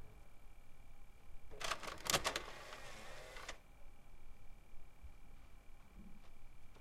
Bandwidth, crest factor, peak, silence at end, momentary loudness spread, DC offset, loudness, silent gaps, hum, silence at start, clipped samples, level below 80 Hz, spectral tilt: 16 kHz; 30 dB; -16 dBFS; 0 s; 27 LU; under 0.1%; -43 LUFS; none; none; 0 s; under 0.1%; -56 dBFS; -1.5 dB/octave